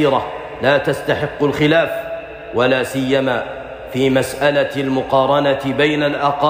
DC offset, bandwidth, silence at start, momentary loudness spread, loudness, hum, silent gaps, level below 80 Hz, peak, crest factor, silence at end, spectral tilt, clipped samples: under 0.1%; 15.5 kHz; 0 s; 11 LU; -17 LUFS; none; none; -46 dBFS; -2 dBFS; 14 dB; 0 s; -5.5 dB/octave; under 0.1%